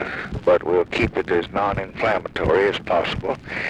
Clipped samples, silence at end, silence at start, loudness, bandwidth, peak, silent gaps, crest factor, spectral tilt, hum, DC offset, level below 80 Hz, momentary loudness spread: under 0.1%; 0 s; 0 s; -21 LUFS; 10 kHz; -6 dBFS; none; 16 dB; -6.5 dB/octave; none; under 0.1%; -40 dBFS; 6 LU